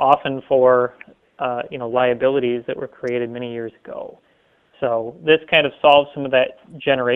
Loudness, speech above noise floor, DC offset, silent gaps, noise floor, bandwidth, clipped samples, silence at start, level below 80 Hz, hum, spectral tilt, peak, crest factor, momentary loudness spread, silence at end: -19 LUFS; 40 dB; under 0.1%; none; -58 dBFS; 5.8 kHz; under 0.1%; 0 s; -58 dBFS; none; -7 dB/octave; 0 dBFS; 20 dB; 14 LU; 0 s